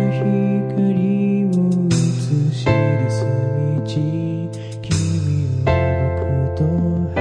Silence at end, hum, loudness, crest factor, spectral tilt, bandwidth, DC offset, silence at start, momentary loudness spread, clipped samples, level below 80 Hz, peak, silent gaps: 0 s; none; -19 LUFS; 16 dB; -7.5 dB/octave; 10 kHz; under 0.1%; 0 s; 4 LU; under 0.1%; -38 dBFS; -2 dBFS; none